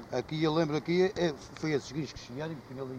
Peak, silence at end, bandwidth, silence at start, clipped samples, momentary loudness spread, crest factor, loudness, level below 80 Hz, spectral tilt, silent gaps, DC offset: -14 dBFS; 0 s; 9.6 kHz; 0 s; under 0.1%; 11 LU; 18 dB; -32 LUFS; -60 dBFS; -6 dB/octave; none; under 0.1%